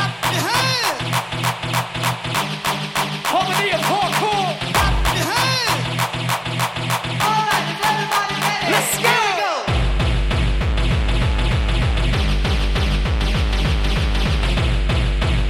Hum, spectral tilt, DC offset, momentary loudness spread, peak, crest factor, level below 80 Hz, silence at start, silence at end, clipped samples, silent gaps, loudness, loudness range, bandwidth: none; -4 dB/octave; under 0.1%; 5 LU; -4 dBFS; 16 dB; -24 dBFS; 0 s; 0 s; under 0.1%; none; -19 LUFS; 2 LU; 17 kHz